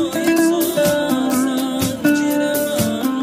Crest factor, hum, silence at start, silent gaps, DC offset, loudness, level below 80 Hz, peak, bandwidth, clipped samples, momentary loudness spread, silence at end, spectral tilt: 14 dB; none; 0 s; none; under 0.1%; -17 LUFS; -48 dBFS; -4 dBFS; 16 kHz; under 0.1%; 4 LU; 0 s; -4.5 dB/octave